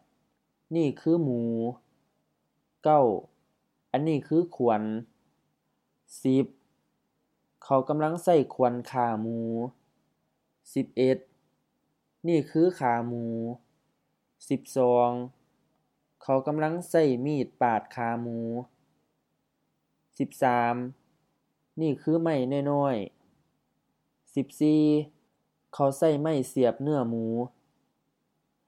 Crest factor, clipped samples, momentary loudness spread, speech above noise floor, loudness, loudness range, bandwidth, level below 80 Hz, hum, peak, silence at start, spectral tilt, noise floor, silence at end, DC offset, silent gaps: 20 dB; under 0.1%; 11 LU; 51 dB; -27 LUFS; 4 LU; 14 kHz; -78 dBFS; none; -10 dBFS; 0.7 s; -7.5 dB/octave; -77 dBFS; 1.2 s; under 0.1%; none